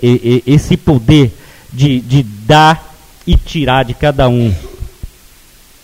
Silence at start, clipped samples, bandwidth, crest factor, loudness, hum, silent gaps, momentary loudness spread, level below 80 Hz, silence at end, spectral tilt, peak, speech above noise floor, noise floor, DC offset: 0 s; 0.4%; 16 kHz; 12 dB; -11 LUFS; none; none; 16 LU; -24 dBFS; 0.75 s; -6.5 dB/octave; 0 dBFS; 32 dB; -42 dBFS; under 0.1%